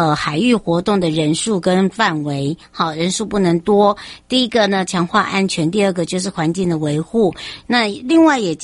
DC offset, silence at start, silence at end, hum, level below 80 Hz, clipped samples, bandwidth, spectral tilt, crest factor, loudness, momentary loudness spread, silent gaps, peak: under 0.1%; 0 s; 0 s; none; -48 dBFS; under 0.1%; 11.5 kHz; -5 dB/octave; 14 dB; -16 LUFS; 7 LU; none; -2 dBFS